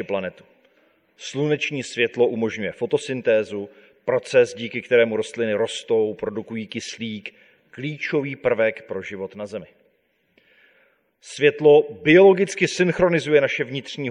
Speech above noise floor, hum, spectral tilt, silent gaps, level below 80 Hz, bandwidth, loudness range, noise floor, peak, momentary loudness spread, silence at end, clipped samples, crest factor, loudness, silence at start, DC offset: 45 dB; none; -5 dB/octave; none; -60 dBFS; 11 kHz; 9 LU; -66 dBFS; -2 dBFS; 17 LU; 0 s; under 0.1%; 20 dB; -21 LUFS; 0 s; under 0.1%